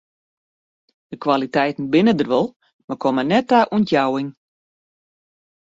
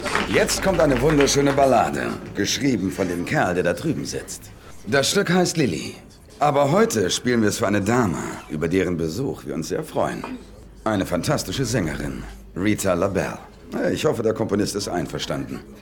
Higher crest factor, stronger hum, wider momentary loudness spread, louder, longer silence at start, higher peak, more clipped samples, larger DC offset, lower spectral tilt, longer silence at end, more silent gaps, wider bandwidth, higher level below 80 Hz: about the same, 18 dB vs 18 dB; neither; about the same, 11 LU vs 12 LU; first, -19 LUFS vs -22 LUFS; first, 1.1 s vs 0 s; about the same, -2 dBFS vs -4 dBFS; neither; neither; first, -7 dB/octave vs -4.5 dB/octave; first, 1.45 s vs 0 s; first, 2.56-2.60 s, 2.73-2.88 s vs none; second, 7.8 kHz vs 19 kHz; second, -62 dBFS vs -42 dBFS